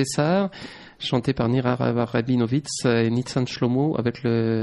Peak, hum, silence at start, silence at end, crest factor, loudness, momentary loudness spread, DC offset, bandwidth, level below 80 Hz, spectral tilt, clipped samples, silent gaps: -6 dBFS; none; 0 s; 0 s; 16 dB; -23 LUFS; 5 LU; under 0.1%; 11.5 kHz; -54 dBFS; -6 dB/octave; under 0.1%; none